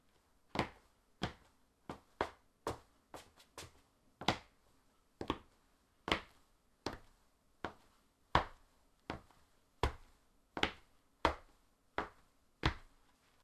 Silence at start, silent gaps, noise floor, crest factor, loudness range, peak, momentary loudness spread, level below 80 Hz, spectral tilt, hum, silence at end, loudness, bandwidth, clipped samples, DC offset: 0.55 s; none; -73 dBFS; 34 dB; 4 LU; -10 dBFS; 19 LU; -54 dBFS; -4.5 dB/octave; none; 0.55 s; -42 LUFS; 13.5 kHz; under 0.1%; under 0.1%